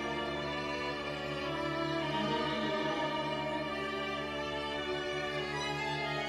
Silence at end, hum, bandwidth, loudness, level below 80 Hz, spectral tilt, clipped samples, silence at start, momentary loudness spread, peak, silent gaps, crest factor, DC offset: 0 s; none; 15 kHz; -35 LUFS; -58 dBFS; -4.5 dB/octave; under 0.1%; 0 s; 3 LU; -20 dBFS; none; 14 dB; under 0.1%